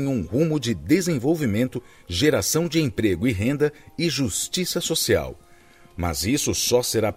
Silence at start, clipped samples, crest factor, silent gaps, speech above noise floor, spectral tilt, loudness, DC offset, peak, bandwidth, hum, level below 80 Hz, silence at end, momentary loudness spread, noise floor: 0 s; under 0.1%; 16 dB; none; 28 dB; -4.5 dB/octave; -22 LUFS; under 0.1%; -6 dBFS; 16 kHz; none; -46 dBFS; 0.05 s; 7 LU; -51 dBFS